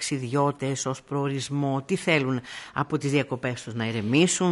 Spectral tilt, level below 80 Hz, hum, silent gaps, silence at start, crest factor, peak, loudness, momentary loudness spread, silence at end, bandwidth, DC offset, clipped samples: -5 dB/octave; -64 dBFS; none; none; 0 s; 18 dB; -8 dBFS; -26 LUFS; 8 LU; 0 s; 11.5 kHz; under 0.1%; under 0.1%